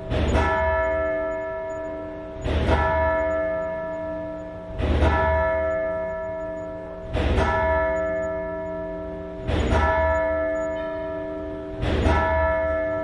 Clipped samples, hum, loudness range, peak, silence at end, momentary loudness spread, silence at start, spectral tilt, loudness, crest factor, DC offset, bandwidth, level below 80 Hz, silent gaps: under 0.1%; none; 2 LU; -8 dBFS; 0 s; 11 LU; 0 s; -7 dB/octave; -24 LUFS; 16 dB; under 0.1%; 10.5 kHz; -32 dBFS; none